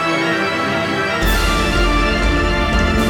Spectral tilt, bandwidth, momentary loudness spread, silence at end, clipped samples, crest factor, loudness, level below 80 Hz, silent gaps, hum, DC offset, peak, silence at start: -4.5 dB/octave; 17.5 kHz; 2 LU; 0 s; under 0.1%; 12 dB; -16 LUFS; -20 dBFS; none; none; under 0.1%; -4 dBFS; 0 s